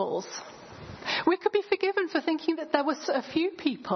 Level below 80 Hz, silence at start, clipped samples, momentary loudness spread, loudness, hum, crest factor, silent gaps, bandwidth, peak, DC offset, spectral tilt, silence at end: -66 dBFS; 0 s; under 0.1%; 14 LU; -28 LUFS; none; 20 dB; none; 6.4 kHz; -8 dBFS; under 0.1%; -4 dB/octave; 0 s